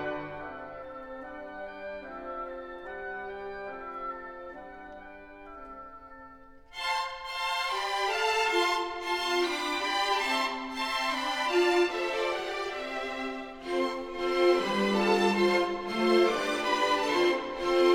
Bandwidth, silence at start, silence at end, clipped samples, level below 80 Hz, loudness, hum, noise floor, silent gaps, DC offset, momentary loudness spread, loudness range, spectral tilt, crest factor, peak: 17 kHz; 0 s; 0 s; under 0.1%; -58 dBFS; -29 LUFS; none; -51 dBFS; none; under 0.1%; 19 LU; 14 LU; -3.5 dB/octave; 18 dB; -12 dBFS